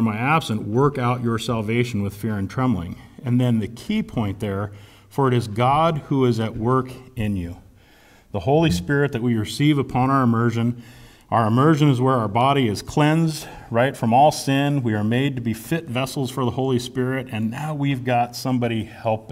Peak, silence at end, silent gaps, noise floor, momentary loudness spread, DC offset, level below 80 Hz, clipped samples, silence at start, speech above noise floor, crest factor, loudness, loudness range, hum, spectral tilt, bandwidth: -4 dBFS; 0 s; none; -51 dBFS; 9 LU; under 0.1%; -48 dBFS; under 0.1%; 0 s; 31 dB; 16 dB; -21 LUFS; 4 LU; none; -6.5 dB/octave; 16 kHz